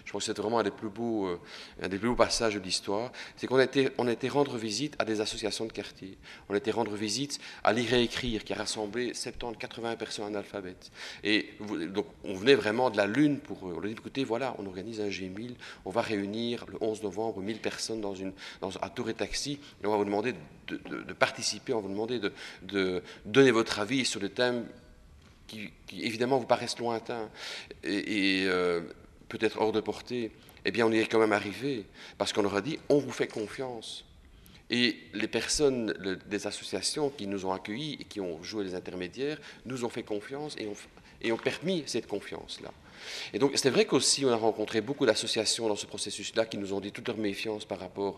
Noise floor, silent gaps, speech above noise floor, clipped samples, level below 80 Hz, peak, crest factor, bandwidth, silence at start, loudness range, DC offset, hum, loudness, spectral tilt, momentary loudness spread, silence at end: -55 dBFS; none; 24 dB; under 0.1%; -58 dBFS; -6 dBFS; 24 dB; 13.5 kHz; 0 s; 6 LU; under 0.1%; none; -31 LUFS; -3.5 dB/octave; 14 LU; 0 s